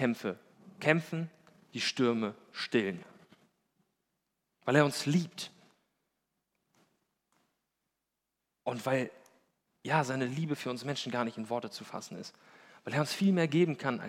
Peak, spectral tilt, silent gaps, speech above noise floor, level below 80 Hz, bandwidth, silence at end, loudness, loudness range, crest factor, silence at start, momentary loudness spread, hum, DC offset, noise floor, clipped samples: -10 dBFS; -5.5 dB/octave; none; 55 dB; -86 dBFS; 16.5 kHz; 0 s; -32 LUFS; 7 LU; 26 dB; 0 s; 16 LU; none; under 0.1%; -86 dBFS; under 0.1%